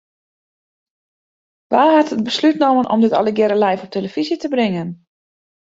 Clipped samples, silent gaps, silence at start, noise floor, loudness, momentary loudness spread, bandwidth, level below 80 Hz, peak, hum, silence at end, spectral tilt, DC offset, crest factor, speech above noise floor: under 0.1%; none; 1.7 s; under -90 dBFS; -16 LUFS; 9 LU; 7.8 kHz; -64 dBFS; -2 dBFS; none; 0.85 s; -6 dB/octave; under 0.1%; 16 dB; over 74 dB